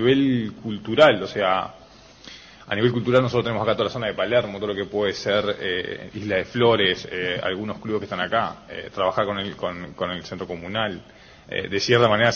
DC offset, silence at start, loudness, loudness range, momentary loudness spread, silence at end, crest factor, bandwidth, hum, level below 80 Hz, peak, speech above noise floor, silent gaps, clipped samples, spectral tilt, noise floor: under 0.1%; 0 s; -23 LUFS; 5 LU; 14 LU; 0 s; 20 dB; 7.8 kHz; none; -54 dBFS; -4 dBFS; 24 dB; none; under 0.1%; -5.5 dB/octave; -46 dBFS